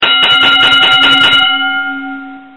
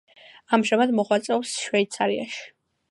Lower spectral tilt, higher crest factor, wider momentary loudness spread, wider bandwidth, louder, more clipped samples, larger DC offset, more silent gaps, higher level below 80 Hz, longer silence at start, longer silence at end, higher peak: second, -2 dB/octave vs -4 dB/octave; second, 10 dB vs 20 dB; first, 16 LU vs 8 LU; about the same, 11.5 kHz vs 11.5 kHz; first, -6 LUFS vs -23 LUFS; first, 0.1% vs under 0.1%; first, 1% vs under 0.1%; neither; first, -46 dBFS vs -76 dBFS; second, 0 s vs 0.5 s; second, 0.1 s vs 0.45 s; first, 0 dBFS vs -4 dBFS